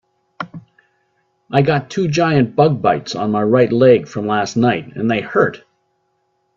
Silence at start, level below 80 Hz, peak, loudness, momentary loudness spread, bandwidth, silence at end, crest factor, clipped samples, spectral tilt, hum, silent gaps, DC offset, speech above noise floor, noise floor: 0.4 s; -54 dBFS; 0 dBFS; -16 LUFS; 8 LU; 7.6 kHz; 1 s; 16 dB; under 0.1%; -6.5 dB/octave; none; none; under 0.1%; 51 dB; -66 dBFS